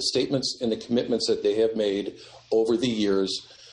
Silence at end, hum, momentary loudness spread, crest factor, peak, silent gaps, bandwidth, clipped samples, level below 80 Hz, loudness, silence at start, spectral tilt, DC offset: 0 s; none; 6 LU; 14 dB; -12 dBFS; none; 11 kHz; under 0.1%; -60 dBFS; -25 LUFS; 0 s; -4.5 dB/octave; under 0.1%